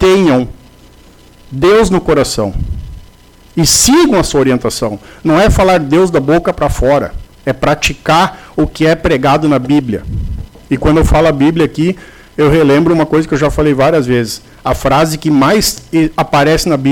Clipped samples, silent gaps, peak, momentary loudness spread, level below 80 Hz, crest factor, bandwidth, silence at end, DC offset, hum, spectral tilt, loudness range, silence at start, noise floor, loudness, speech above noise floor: under 0.1%; none; 0 dBFS; 12 LU; -24 dBFS; 10 dB; 19 kHz; 0 s; under 0.1%; none; -5 dB/octave; 2 LU; 0 s; -40 dBFS; -11 LUFS; 30 dB